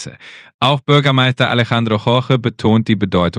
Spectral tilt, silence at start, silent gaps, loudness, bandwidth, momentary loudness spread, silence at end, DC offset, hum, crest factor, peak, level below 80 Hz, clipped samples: -6.5 dB/octave; 0 s; 0.54-0.59 s; -14 LUFS; 10 kHz; 4 LU; 0 s; under 0.1%; none; 14 dB; 0 dBFS; -48 dBFS; under 0.1%